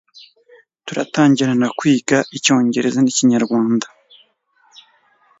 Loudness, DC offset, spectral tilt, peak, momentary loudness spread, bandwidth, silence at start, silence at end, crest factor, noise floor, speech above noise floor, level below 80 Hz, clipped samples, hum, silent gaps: -16 LUFS; under 0.1%; -4.5 dB/octave; 0 dBFS; 10 LU; 8 kHz; 0.85 s; 1.55 s; 18 dB; -59 dBFS; 43 dB; -64 dBFS; under 0.1%; none; none